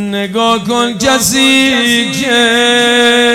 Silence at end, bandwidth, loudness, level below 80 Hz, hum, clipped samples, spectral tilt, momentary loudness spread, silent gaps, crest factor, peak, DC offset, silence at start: 0 s; 17.5 kHz; -9 LUFS; -44 dBFS; none; 0.2%; -2.5 dB/octave; 5 LU; none; 10 dB; 0 dBFS; 0.1%; 0 s